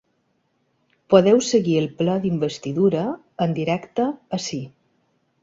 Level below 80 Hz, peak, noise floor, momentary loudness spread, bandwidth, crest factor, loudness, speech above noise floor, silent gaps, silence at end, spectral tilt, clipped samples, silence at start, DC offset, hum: -60 dBFS; -2 dBFS; -68 dBFS; 12 LU; 7.8 kHz; 20 dB; -21 LUFS; 48 dB; none; 0.75 s; -6 dB/octave; under 0.1%; 1.1 s; under 0.1%; none